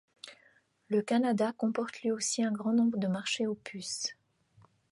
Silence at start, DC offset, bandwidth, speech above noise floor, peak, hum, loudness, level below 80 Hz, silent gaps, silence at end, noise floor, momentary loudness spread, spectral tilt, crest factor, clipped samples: 0.25 s; under 0.1%; 11.5 kHz; 36 dB; -18 dBFS; none; -32 LUFS; -80 dBFS; none; 0.8 s; -67 dBFS; 10 LU; -4 dB/octave; 14 dB; under 0.1%